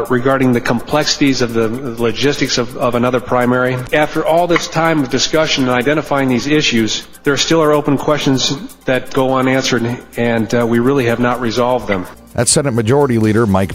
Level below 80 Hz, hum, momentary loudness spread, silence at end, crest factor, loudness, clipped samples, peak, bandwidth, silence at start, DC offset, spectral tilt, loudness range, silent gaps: -40 dBFS; none; 5 LU; 0 s; 14 dB; -14 LUFS; under 0.1%; 0 dBFS; 16 kHz; 0 s; under 0.1%; -4.5 dB/octave; 1 LU; none